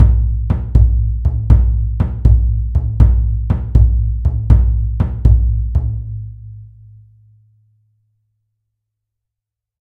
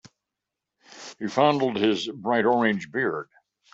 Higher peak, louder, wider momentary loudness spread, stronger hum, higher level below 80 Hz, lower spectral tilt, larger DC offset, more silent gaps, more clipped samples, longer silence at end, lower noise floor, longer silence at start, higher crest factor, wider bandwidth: first, 0 dBFS vs -6 dBFS; first, -15 LUFS vs -24 LUFS; second, 8 LU vs 17 LU; neither; first, -16 dBFS vs -70 dBFS; first, -11 dB/octave vs -5.5 dB/octave; neither; neither; first, 0.2% vs under 0.1%; first, 3.35 s vs 0.5 s; about the same, -83 dBFS vs -86 dBFS; second, 0 s vs 0.9 s; second, 14 dB vs 20 dB; second, 2.1 kHz vs 8 kHz